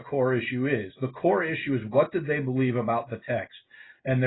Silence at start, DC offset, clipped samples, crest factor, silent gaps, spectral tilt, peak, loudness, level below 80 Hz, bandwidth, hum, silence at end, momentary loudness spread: 0 s; under 0.1%; under 0.1%; 18 dB; none; -11.5 dB/octave; -10 dBFS; -27 LUFS; -62 dBFS; 4.1 kHz; none; 0 s; 7 LU